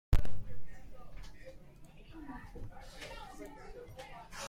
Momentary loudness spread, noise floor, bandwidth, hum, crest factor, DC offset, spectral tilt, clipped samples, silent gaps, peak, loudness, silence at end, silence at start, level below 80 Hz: 8 LU; -54 dBFS; 16 kHz; none; 18 dB; under 0.1%; -5.5 dB/octave; under 0.1%; none; -14 dBFS; -47 LUFS; 0 s; 0.1 s; -42 dBFS